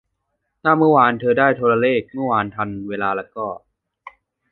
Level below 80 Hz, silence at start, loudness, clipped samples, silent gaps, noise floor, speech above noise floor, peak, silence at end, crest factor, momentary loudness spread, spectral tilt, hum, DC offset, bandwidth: -58 dBFS; 0.65 s; -18 LUFS; under 0.1%; none; -74 dBFS; 56 dB; -2 dBFS; 0.45 s; 18 dB; 14 LU; -10 dB/octave; none; under 0.1%; 4.3 kHz